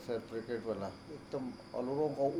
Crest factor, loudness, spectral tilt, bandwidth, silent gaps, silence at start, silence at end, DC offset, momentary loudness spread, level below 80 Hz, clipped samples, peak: 16 dB; -39 LUFS; -7 dB/octave; 14 kHz; none; 0 s; 0 s; under 0.1%; 8 LU; -68 dBFS; under 0.1%; -22 dBFS